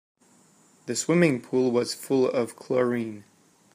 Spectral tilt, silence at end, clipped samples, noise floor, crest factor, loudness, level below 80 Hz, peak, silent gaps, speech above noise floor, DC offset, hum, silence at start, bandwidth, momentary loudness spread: -5 dB/octave; 0.55 s; under 0.1%; -59 dBFS; 18 dB; -25 LUFS; -72 dBFS; -8 dBFS; none; 35 dB; under 0.1%; none; 0.85 s; 15.5 kHz; 12 LU